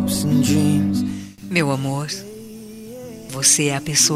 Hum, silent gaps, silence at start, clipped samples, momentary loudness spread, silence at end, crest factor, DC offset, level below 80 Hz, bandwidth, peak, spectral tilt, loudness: none; none; 0 s; under 0.1%; 21 LU; 0 s; 18 dB; under 0.1%; -50 dBFS; 16 kHz; -2 dBFS; -3.5 dB/octave; -18 LUFS